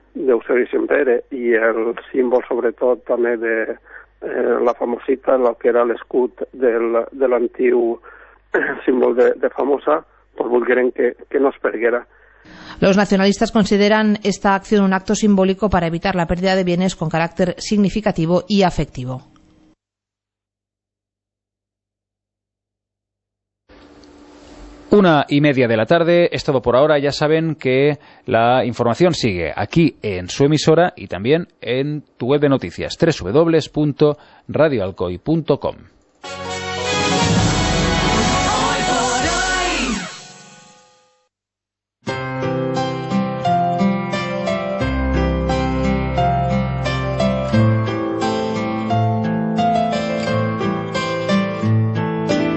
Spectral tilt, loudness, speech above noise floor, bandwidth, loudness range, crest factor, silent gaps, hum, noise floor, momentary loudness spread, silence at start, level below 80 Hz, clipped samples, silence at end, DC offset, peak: -5.5 dB/octave; -18 LUFS; 69 dB; 8.4 kHz; 5 LU; 16 dB; none; 50 Hz at -45 dBFS; -86 dBFS; 8 LU; 0.15 s; -36 dBFS; under 0.1%; 0 s; under 0.1%; -2 dBFS